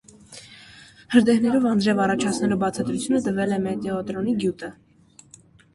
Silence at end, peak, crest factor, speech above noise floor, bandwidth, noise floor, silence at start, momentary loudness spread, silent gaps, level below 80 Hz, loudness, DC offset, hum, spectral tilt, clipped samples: 1 s; -2 dBFS; 20 dB; 31 dB; 11.5 kHz; -53 dBFS; 0.3 s; 21 LU; none; -58 dBFS; -22 LUFS; under 0.1%; none; -5.5 dB/octave; under 0.1%